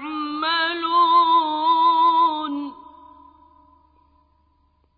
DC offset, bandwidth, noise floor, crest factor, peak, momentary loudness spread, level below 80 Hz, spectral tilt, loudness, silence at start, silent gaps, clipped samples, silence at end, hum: under 0.1%; 4.9 kHz; -63 dBFS; 14 dB; -8 dBFS; 12 LU; -64 dBFS; -6.5 dB/octave; -19 LUFS; 0 s; none; under 0.1%; 2.25 s; none